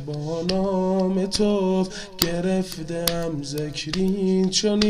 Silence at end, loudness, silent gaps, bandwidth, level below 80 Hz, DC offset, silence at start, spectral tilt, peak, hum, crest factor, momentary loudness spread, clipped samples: 0 s; -23 LUFS; none; 15.5 kHz; -42 dBFS; 0.2%; 0 s; -5 dB/octave; 0 dBFS; none; 22 dB; 8 LU; under 0.1%